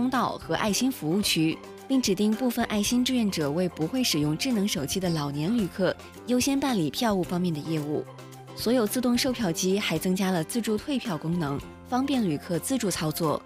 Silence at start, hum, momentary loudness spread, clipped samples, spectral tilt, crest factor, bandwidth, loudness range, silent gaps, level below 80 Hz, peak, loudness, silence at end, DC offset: 0 s; none; 5 LU; under 0.1%; -4.5 dB/octave; 14 dB; 16 kHz; 2 LU; none; -54 dBFS; -12 dBFS; -26 LUFS; 0 s; under 0.1%